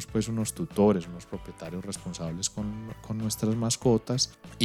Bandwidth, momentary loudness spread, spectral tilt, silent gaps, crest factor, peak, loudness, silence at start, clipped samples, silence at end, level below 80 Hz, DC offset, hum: 15.5 kHz; 15 LU; -5 dB/octave; none; 22 dB; -8 dBFS; -29 LUFS; 0 s; under 0.1%; 0 s; -52 dBFS; under 0.1%; none